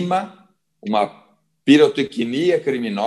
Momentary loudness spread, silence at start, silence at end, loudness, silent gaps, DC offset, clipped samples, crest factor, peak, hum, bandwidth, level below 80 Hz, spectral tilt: 12 LU; 0 s; 0 s; -18 LUFS; none; under 0.1%; under 0.1%; 18 dB; -2 dBFS; none; 11.5 kHz; -70 dBFS; -6 dB/octave